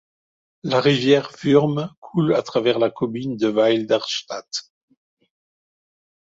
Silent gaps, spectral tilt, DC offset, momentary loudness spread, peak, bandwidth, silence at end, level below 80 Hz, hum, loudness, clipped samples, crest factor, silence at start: 1.97-2.02 s; -5.5 dB/octave; under 0.1%; 11 LU; -2 dBFS; 7.8 kHz; 1.6 s; -62 dBFS; none; -20 LUFS; under 0.1%; 20 dB; 0.65 s